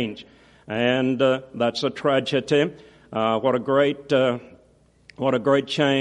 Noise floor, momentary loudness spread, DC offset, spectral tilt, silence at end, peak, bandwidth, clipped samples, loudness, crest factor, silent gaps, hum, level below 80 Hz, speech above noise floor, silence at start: -57 dBFS; 8 LU; under 0.1%; -6 dB/octave; 0 s; -6 dBFS; 11 kHz; under 0.1%; -22 LUFS; 16 dB; none; none; -62 dBFS; 36 dB; 0 s